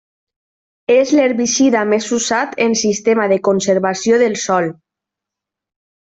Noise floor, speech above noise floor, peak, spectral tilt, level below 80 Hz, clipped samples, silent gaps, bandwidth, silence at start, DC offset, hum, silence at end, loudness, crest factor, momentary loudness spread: -84 dBFS; 69 dB; -2 dBFS; -3.5 dB/octave; -60 dBFS; under 0.1%; none; 8.4 kHz; 0.9 s; under 0.1%; none; 1.3 s; -15 LUFS; 14 dB; 4 LU